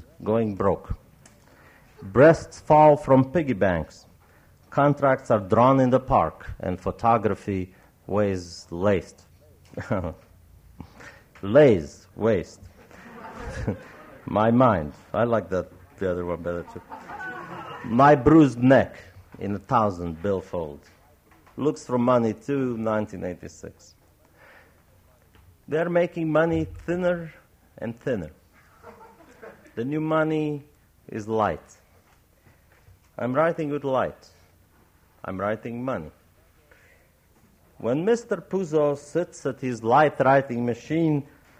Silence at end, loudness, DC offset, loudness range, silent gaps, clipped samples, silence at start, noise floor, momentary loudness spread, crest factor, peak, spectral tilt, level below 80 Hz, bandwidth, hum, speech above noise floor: 0.35 s; -23 LUFS; under 0.1%; 10 LU; none; under 0.1%; 0.2 s; -59 dBFS; 20 LU; 20 dB; -6 dBFS; -7.5 dB/octave; -50 dBFS; 15.5 kHz; none; 36 dB